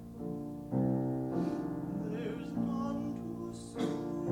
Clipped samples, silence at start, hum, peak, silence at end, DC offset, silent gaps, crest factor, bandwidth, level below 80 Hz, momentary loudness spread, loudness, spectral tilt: under 0.1%; 0 s; none; -20 dBFS; 0 s; under 0.1%; none; 16 dB; 18 kHz; -60 dBFS; 9 LU; -37 LUFS; -8 dB/octave